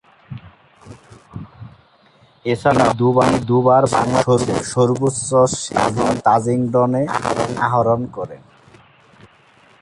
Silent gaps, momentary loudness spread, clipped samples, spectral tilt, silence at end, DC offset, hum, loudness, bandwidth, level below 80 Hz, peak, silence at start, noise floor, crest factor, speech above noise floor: none; 22 LU; under 0.1%; -5.5 dB/octave; 1.45 s; under 0.1%; none; -17 LUFS; 11.5 kHz; -48 dBFS; -2 dBFS; 0.3 s; -52 dBFS; 16 dB; 36 dB